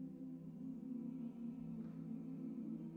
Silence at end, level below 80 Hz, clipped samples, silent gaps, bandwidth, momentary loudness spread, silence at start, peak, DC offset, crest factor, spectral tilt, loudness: 0 s; -78 dBFS; under 0.1%; none; 3.9 kHz; 3 LU; 0 s; -38 dBFS; under 0.1%; 10 dB; -10.5 dB/octave; -49 LUFS